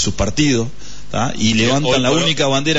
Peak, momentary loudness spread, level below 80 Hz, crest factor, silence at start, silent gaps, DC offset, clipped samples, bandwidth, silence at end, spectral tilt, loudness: -4 dBFS; 8 LU; -36 dBFS; 12 dB; 0 s; none; 6%; under 0.1%; 8 kHz; 0 s; -4 dB/octave; -16 LUFS